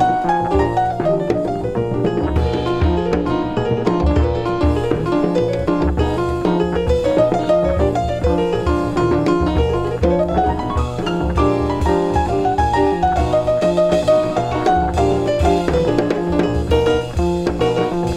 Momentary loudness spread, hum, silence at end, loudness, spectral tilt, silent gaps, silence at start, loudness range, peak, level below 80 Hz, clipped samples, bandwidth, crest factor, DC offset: 3 LU; none; 0 s; -17 LUFS; -7.5 dB/octave; none; 0 s; 2 LU; -2 dBFS; -26 dBFS; under 0.1%; 11.5 kHz; 14 dB; under 0.1%